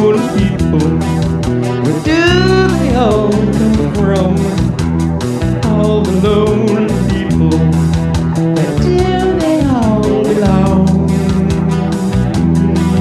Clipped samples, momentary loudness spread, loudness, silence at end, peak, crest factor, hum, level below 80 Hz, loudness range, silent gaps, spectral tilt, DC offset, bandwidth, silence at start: under 0.1%; 4 LU; -12 LUFS; 0 s; 0 dBFS; 10 dB; none; -24 dBFS; 1 LU; none; -7 dB/octave; under 0.1%; 12.5 kHz; 0 s